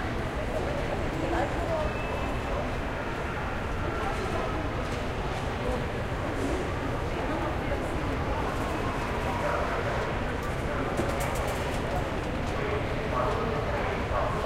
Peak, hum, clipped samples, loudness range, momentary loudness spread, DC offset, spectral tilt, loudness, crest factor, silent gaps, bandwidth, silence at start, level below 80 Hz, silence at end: -14 dBFS; none; under 0.1%; 2 LU; 3 LU; under 0.1%; -6 dB/octave; -30 LUFS; 16 dB; none; 16 kHz; 0 s; -36 dBFS; 0 s